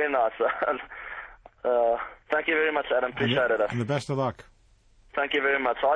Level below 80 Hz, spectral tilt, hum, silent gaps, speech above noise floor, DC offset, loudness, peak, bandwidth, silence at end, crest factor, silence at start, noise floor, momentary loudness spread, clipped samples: -58 dBFS; -6 dB/octave; none; none; 34 dB; under 0.1%; -26 LUFS; -10 dBFS; 10 kHz; 0 s; 18 dB; 0 s; -59 dBFS; 11 LU; under 0.1%